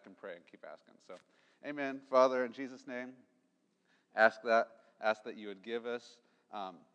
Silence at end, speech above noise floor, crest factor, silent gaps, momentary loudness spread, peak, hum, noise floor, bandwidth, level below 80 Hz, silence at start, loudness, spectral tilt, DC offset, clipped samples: 0.2 s; 41 dB; 24 dB; none; 24 LU; -12 dBFS; none; -77 dBFS; 8.8 kHz; under -90 dBFS; 0.05 s; -35 LUFS; -4 dB/octave; under 0.1%; under 0.1%